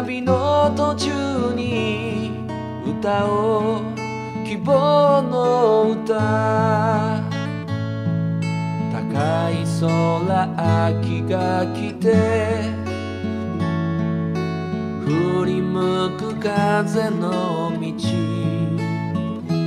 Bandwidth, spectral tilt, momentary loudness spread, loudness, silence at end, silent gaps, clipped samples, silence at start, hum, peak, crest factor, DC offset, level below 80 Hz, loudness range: 11.5 kHz; -7 dB/octave; 9 LU; -21 LUFS; 0 s; none; under 0.1%; 0 s; none; -4 dBFS; 16 dB; under 0.1%; -54 dBFS; 4 LU